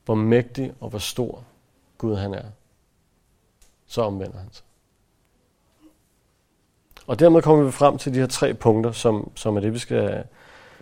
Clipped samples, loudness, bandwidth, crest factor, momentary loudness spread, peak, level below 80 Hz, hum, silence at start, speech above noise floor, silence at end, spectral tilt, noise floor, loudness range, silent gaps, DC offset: under 0.1%; -21 LUFS; 16.5 kHz; 22 dB; 19 LU; -2 dBFS; -50 dBFS; none; 0.1 s; 45 dB; 0.55 s; -6.5 dB/octave; -66 dBFS; 15 LU; none; under 0.1%